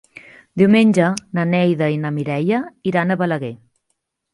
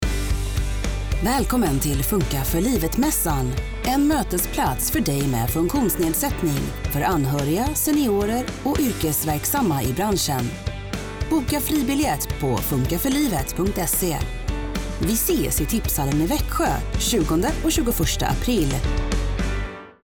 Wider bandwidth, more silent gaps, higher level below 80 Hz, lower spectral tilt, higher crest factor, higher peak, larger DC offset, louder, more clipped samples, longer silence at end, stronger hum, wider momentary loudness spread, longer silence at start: second, 11.5 kHz vs over 20 kHz; neither; second, -62 dBFS vs -30 dBFS; first, -7 dB/octave vs -4.5 dB/octave; first, 16 dB vs 10 dB; first, -2 dBFS vs -12 dBFS; neither; first, -18 LUFS vs -22 LUFS; neither; first, 0.8 s vs 0.15 s; neither; first, 9 LU vs 6 LU; first, 0.55 s vs 0 s